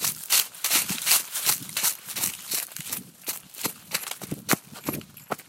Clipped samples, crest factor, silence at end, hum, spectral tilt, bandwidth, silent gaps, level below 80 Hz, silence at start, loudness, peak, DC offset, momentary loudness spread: under 0.1%; 28 dB; 0.05 s; none; -0.5 dB/octave; 16.5 kHz; none; -66 dBFS; 0 s; -25 LUFS; -2 dBFS; under 0.1%; 13 LU